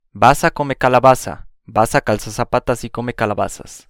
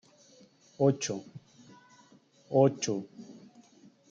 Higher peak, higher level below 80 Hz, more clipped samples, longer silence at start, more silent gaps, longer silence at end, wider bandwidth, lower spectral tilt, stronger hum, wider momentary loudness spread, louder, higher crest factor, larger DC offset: first, 0 dBFS vs -10 dBFS; first, -36 dBFS vs -78 dBFS; first, 0.1% vs under 0.1%; second, 0.15 s vs 0.8 s; neither; second, 0.1 s vs 0.75 s; first, 18 kHz vs 8.6 kHz; about the same, -5 dB/octave vs -5.5 dB/octave; neither; second, 11 LU vs 25 LU; first, -16 LUFS vs -29 LUFS; second, 16 dB vs 22 dB; neither